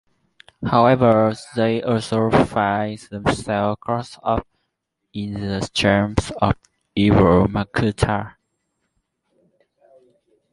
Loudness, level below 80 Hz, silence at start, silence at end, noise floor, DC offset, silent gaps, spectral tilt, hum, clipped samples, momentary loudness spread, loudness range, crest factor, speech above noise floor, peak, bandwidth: -20 LUFS; -38 dBFS; 0.6 s; 2.25 s; -76 dBFS; under 0.1%; none; -6.5 dB/octave; none; under 0.1%; 13 LU; 5 LU; 18 dB; 58 dB; -2 dBFS; 11.5 kHz